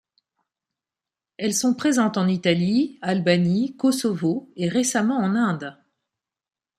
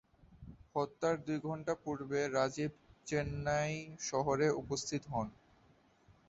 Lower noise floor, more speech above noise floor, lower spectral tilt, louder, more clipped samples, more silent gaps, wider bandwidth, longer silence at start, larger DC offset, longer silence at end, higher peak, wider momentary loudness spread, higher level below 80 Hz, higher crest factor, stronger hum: first, under -90 dBFS vs -68 dBFS; first, over 69 dB vs 32 dB; about the same, -5 dB/octave vs -5 dB/octave; first, -22 LUFS vs -37 LUFS; neither; neither; first, 14.5 kHz vs 8 kHz; first, 1.4 s vs 0.3 s; neither; about the same, 1.05 s vs 0.95 s; first, -4 dBFS vs -18 dBFS; second, 5 LU vs 9 LU; about the same, -66 dBFS vs -62 dBFS; about the same, 18 dB vs 20 dB; neither